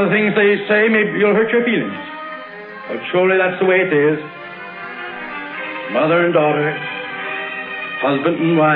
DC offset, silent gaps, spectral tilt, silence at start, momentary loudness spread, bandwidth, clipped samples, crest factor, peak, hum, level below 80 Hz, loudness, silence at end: under 0.1%; none; -9.5 dB/octave; 0 s; 15 LU; 4.8 kHz; under 0.1%; 16 dB; -2 dBFS; none; -66 dBFS; -17 LUFS; 0 s